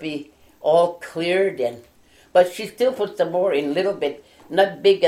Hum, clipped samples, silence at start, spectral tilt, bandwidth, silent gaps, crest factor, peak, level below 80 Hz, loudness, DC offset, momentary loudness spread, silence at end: none; under 0.1%; 0 s; -5 dB/octave; 15.5 kHz; none; 18 dB; -2 dBFS; -64 dBFS; -21 LUFS; under 0.1%; 9 LU; 0 s